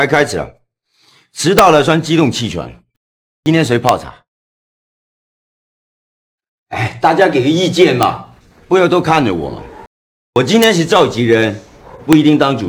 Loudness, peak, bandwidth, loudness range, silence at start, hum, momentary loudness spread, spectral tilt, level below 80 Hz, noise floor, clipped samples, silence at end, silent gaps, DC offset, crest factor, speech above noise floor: -12 LUFS; 0 dBFS; over 20 kHz; 6 LU; 0 s; none; 16 LU; -5 dB/octave; -44 dBFS; -57 dBFS; under 0.1%; 0 s; 2.97-3.43 s, 4.28-6.38 s, 6.48-6.66 s, 9.87-10.33 s; under 0.1%; 14 dB; 46 dB